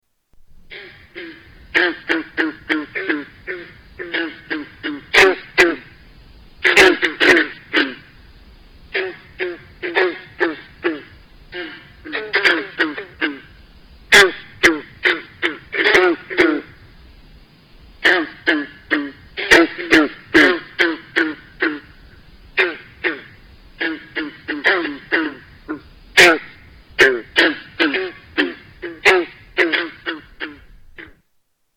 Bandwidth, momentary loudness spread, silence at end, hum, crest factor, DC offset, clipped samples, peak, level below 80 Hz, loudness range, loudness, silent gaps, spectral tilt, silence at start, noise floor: 19 kHz; 20 LU; 0.7 s; none; 18 dB; under 0.1%; under 0.1%; -2 dBFS; -48 dBFS; 8 LU; -17 LUFS; none; -2.5 dB/octave; 0.7 s; -67 dBFS